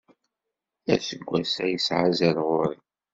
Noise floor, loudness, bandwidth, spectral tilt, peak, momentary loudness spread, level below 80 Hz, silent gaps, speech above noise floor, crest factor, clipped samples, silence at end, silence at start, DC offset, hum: -85 dBFS; -25 LUFS; 7.8 kHz; -5 dB/octave; -6 dBFS; 8 LU; -64 dBFS; none; 61 dB; 22 dB; under 0.1%; 0.4 s; 0.85 s; under 0.1%; none